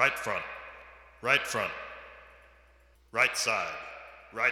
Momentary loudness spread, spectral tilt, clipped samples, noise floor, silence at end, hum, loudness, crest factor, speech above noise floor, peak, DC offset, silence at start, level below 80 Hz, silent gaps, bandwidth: 21 LU; -1.5 dB/octave; under 0.1%; -61 dBFS; 0 s; none; -29 LUFS; 24 dB; 31 dB; -8 dBFS; under 0.1%; 0 s; -62 dBFS; none; 18 kHz